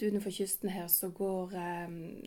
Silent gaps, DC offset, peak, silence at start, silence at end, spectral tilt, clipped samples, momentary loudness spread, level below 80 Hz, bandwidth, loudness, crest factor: none; under 0.1%; -16 dBFS; 0 s; 0 s; -4.5 dB/octave; under 0.1%; 10 LU; -66 dBFS; 19 kHz; -34 LUFS; 20 dB